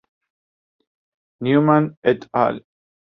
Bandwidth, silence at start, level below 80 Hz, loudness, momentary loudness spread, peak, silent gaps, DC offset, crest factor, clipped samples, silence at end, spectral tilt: 5.6 kHz; 1.4 s; -64 dBFS; -19 LUFS; 10 LU; -2 dBFS; 1.97-2.02 s; under 0.1%; 20 dB; under 0.1%; 0.55 s; -9.5 dB/octave